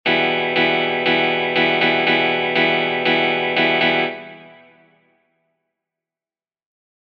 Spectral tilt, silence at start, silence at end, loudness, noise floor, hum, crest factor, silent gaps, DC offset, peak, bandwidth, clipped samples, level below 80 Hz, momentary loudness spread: -6 dB/octave; 0.05 s; 2.55 s; -17 LUFS; under -90 dBFS; none; 16 dB; none; under 0.1%; -4 dBFS; 6.6 kHz; under 0.1%; -62 dBFS; 2 LU